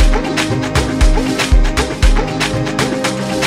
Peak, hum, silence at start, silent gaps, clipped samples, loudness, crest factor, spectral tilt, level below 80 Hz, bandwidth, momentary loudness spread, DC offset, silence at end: 0 dBFS; none; 0 s; none; under 0.1%; -15 LUFS; 12 dB; -4.5 dB/octave; -16 dBFS; 14.5 kHz; 3 LU; under 0.1%; 0 s